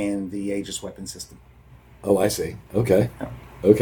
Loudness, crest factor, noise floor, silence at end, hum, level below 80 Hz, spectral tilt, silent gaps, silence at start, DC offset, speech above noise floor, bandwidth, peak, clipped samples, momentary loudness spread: -24 LUFS; 24 dB; -49 dBFS; 0 s; none; -48 dBFS; -6 dB/octave; none; 0 s; under 0.1%; 25 dB; 19 kHz; 0 dBFS; under 0.1%; 16 LU